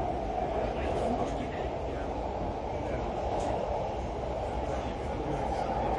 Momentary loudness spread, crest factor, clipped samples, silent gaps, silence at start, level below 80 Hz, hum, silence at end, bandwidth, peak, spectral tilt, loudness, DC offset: 4 LU; 14 dB; under 0.1%; none; 0 s; -40 dBFS; none; 0 s; 11 kHz; -18 dBFS; -7 dB/octave; -33 LUFS; under 0.1%